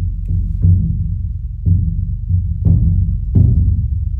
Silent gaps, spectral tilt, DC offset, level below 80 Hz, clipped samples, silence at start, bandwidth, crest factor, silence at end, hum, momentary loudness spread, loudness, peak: none; -13.5 dB/octave; under 0.1%; -18 dBFS; under 0.1%; 0 s; 0.9 kHz; 12 dB; 0 s; none; 8 LU; -16 LUFS; -2 dBFS